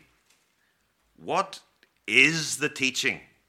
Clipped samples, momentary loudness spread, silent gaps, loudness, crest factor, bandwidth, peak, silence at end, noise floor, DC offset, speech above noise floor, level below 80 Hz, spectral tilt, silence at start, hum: under 0.1%; 23 LU; none; -24 LUFS; 26 dB; 17 kHz; -4 dBFS; 0.3 s; -70 dBFS; under 0.1%; 45 dB; -74 dBFS; -2 dB/octave; 1.2 s; none